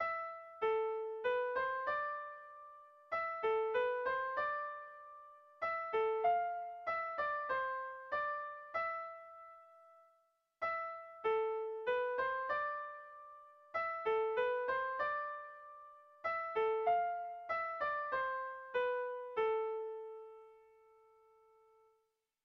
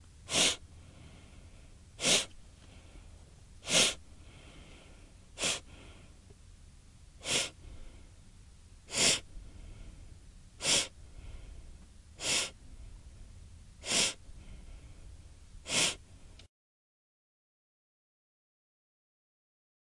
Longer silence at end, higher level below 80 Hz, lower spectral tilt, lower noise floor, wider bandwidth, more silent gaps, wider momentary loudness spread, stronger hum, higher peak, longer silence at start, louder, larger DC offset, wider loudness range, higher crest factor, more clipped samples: second, 1.85 s vs 3.6 s; second, -78 dBFS vs -54 dBFS; about the same, 0.5 dB/octave vs -0.5 dB/octave; first, -82 dBFS vs -55 dBFS; second, 6 kHz vs 11.5 kHz; neither; second, 19 LU vs 27 LU; neither; second, -24 dBFS vs -14 dBFS; second, 0 s vs 0.2 s; second, -38 LUFS vs -30 LUFS; neither; about the same, 4 LU vs 6 LU; second, 16 dB vs 26 dB; neither